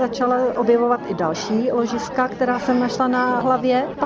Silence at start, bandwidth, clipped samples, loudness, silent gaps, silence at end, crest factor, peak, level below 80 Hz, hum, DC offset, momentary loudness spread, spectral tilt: 0 s; 7.6 kHz; under 0.1%; -20 LUFS; none; 0 s; 14 dB; -6 dBFS; -54 dBFS; none; under 0.1%; 4 LU; -5.5 dB/octave